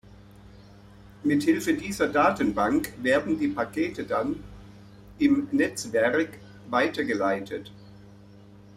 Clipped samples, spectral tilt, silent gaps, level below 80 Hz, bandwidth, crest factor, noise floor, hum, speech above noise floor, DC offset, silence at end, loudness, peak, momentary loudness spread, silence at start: under 0.1%; -5 dB/octave; none; -54 dBFS; 15.5 kHz; 18 dB; -50 dBFS; none; 25 dB; under 0.1%; 0.15 s; -26 LUFS; -8 dBFS; 10 LU; 0.45 s